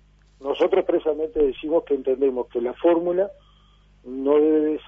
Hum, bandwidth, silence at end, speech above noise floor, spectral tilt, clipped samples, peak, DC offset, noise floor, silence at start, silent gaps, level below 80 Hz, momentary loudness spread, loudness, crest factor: 50 Hz at -55 dBFS; 3.7 kHz; 0.05 s; 33 dB; -7.5 dB/octave; under 0.1%; -8 dBFS; under 0.1%; -55 dBFS; 0.4 s; none; -50 dBFS; 9 LU; -22 LUFS; 16 dB